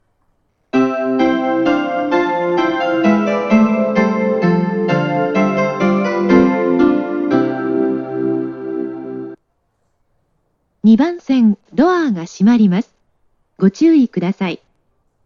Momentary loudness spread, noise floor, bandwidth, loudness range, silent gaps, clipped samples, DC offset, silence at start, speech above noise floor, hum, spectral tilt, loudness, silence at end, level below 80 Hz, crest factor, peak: 10 LU; -65 dBFS; 7.2 kHz; 5 LU; none; under 0.1%; under 0.1%; 0.75 s; 52 dB; none; -7.5 dB/octave; -15 LUFS; 0.7 s; -52 dBFS; 16 dB; 0 dBFS